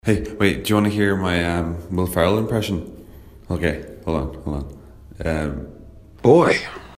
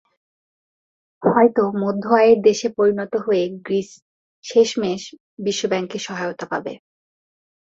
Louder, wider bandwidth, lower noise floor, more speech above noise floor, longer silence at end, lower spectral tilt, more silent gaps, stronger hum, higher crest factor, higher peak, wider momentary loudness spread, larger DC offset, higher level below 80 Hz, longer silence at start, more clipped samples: about the same, -21 LUFS vs -19 LUFS; first, 16 kHz vs 7.8 kHz; second, -42 dBFS vs under -90 dBFS; second, 22 dB vs over 71 dB; second, 0.05 s vs 0.9 s; about the same, -6 dB/octave vs -5 dB/octave; second, none vs 4.02-4.43 s, 5.20-5.37 s; neither; about the same, 20 dB vs 18 dB; about the same, 0 dBFS vs -2 dBFS; about the same, 14 LU vs 13 LU; neither; first, -38 dBFS vs -64 dBFS; second, 0.05 s vs 1.2 s; neither